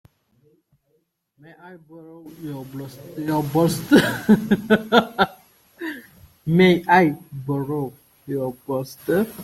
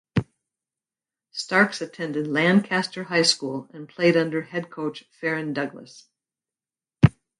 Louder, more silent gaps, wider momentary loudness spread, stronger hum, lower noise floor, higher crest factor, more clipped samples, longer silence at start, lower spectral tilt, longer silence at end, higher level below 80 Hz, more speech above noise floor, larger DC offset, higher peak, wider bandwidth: first, -20 LUFS vs -23 LUFS; neither; first, 18 LU vs 13 LU; neither; second, -69 dBFS vs under -90 dBFS; about the same, 20 dB vs 24 dB; neither; first, 1.65 s vs 0.15 s; about the same, -6 dB/octave vs -5 dB/octave; second, 0 s vs 0.3 s; second, -56 dBFS vs -50 dBFS; second, 49 dB vs over 66 dB; neither; about the same, -2 dBFS vs 0 dBFS; first, 16.5 kHz vs 11.5 kHz